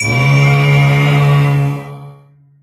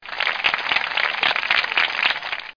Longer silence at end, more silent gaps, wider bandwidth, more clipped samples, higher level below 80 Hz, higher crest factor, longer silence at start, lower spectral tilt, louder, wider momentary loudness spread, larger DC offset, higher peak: first, 0.5 s vs 0.05 s; neither; first, 12 kHz vs 5.4 kHz; neither; first, -40 dBFS vs -60 dBFS; about the same, 12 dB vs 16 dB; about the same, 0 s vs 0 s; first, -6.5 dB/octave vs -1 dB/octave; first, -11 LUFS vs -19 LUFS; first, 10 LU vs 3 LU; neither; first, 0 dBFS vs -6 dBFS